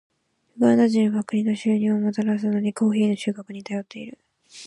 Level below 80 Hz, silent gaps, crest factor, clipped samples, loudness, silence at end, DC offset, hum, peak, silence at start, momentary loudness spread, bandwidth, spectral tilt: -70 dBFS; none; 16 dB; under 0.1%; -22 LUFS; 0 s; under 0.1%; none; -6 dBFS; 0.55 s; 14 LU; 11 kHz; -7 dB/octave